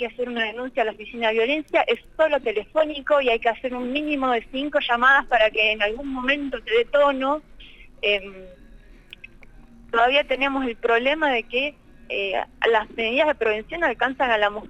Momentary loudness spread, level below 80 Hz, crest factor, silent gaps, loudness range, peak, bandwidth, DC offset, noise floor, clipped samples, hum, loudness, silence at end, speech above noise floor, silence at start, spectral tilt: 8 LU; -48 dBFS; 18 dB; none; 5 LU; -6 dBFS; 9 kHz; under 0.1%; -47 dBFS; under 0.1%; none; -22 LUFS; 0 s; 24 dB; 0 s; -4 dB/octave